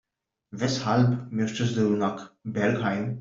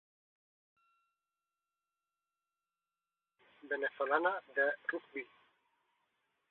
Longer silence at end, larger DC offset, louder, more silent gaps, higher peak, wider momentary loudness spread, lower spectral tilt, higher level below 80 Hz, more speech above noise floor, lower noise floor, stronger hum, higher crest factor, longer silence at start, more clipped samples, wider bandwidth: second, 0 s vs 1.25 s; neither; first, -26 LUFS vs -36 LUFS; neither; first, -10 dBFS vs -18 dBFS; second, 9 LU vs 14 LU; first, -6.5 dB/octave vs 0 dB/octave; first, -62 dBFS vs under -90 dBFS; second, 41 dB vs over 54 dB; second, -66 dBFS vs under -90 dBFS; second, none vs 50 Hz at -105 dBFS; second, 18 dB vs 24 dB; second, 0.5 s vs 3.65 s; neither; first, 7.6 kHz vs 4.2 kHz